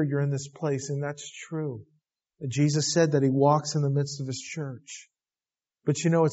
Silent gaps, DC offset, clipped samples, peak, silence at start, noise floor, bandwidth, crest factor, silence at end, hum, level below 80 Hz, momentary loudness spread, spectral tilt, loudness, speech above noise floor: none; under 0.1%; under 0.1%; -10 dBFS; 0 s; under -90 dBFS; 8 kHz; 18 dB; 0 s; none; -70 dBFS; 16 LU; -6.5 dB/octave; -27 LUFS; over 64 dB